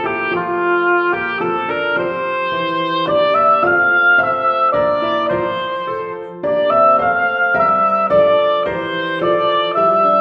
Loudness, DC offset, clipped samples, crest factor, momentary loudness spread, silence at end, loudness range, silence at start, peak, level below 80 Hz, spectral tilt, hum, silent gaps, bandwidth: -15 LUFS; under 0.1%; under 0.1%; 14 dB; 8 LU; 0 s; 2 LU; 0 s; -2 dBFS; -52 dBFS; -7 dB/octave; none; none; 5.8 kHz